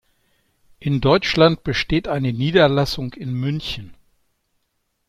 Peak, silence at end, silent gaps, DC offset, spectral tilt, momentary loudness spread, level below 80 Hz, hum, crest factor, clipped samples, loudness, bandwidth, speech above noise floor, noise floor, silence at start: -2 dBFS; 1.15 s; none; under 0.1%; -6.5 dB/octave; 12 LU; -42 dBFS; none; 18 dB; under 0.1%; -19 LUFS; 14 kHz; 53 dB; -71 dBFS; 0.8 s